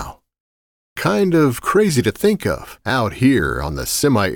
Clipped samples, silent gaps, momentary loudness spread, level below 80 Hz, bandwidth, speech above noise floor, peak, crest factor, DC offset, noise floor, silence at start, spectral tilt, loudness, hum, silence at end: under 0.1%; 0.40-0.96 s; 8 LU; -38 dBFS; 19 kHz; over 73 dB; -4 dBFS; 14 dB; under 0.1%; under -90 dBFS; 0 s; -5 dB/octave; -17 LUFS; none; 0 s